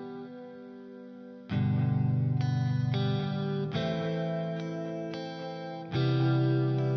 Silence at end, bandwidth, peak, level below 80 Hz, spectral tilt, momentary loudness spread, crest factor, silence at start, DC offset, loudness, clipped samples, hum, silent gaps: 0 s; 6.2 kHz; -16 dBFS; -68 dBFS; -8.5 dB/octave; 19 LU; 14 dB; 0 s; under 0.1%; -30 LUFS; under 0.1%; none; none